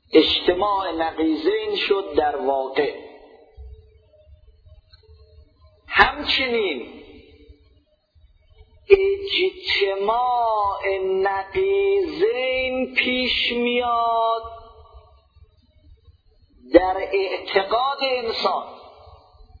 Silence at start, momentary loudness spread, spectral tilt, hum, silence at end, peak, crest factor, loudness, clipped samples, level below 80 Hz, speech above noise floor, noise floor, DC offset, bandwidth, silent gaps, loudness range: 0.1 s; 7 LU; -5.5 dB/octave; none; 0.45 s; 0 dBFS; 22 dB; -21 LUFS; under 0.1%; -48 dBFS; 38 dB; -59 dBFS; under 0.1%; 5.2 kHz; none; 5 LU